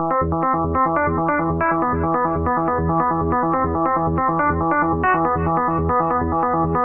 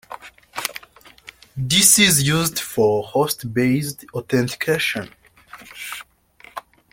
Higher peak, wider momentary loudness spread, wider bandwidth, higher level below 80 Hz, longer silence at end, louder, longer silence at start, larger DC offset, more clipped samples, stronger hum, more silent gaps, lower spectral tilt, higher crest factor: second, -6 dBFS vs 0 dBFS; second, 2 LU vs 25 LU; second, 3.1 kHz vs 17 kHz; first, -36 dBFS vs -54 dBFS; second, 0 s vs 0.35 s; about the same, -19 LUFS vs -18 LUFS; about the same, 0 s vs 0.1 s; neither; neither; neither; neither; first, -12 dB/octave vs -3 dB/octave; second, 14 dB vs 22 dB